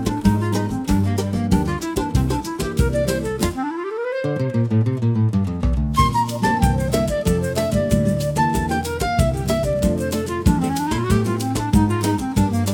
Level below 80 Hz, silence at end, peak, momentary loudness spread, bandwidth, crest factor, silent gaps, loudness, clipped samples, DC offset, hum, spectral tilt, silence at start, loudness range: -30 dBFS; 0 s; -2 dBFS; 4 LU; 18 kHz; 16 dB; none; -20 LUFS; under 0.1%; under 0.1%; none; -6.5 dB/octave; 0 s; 2 LU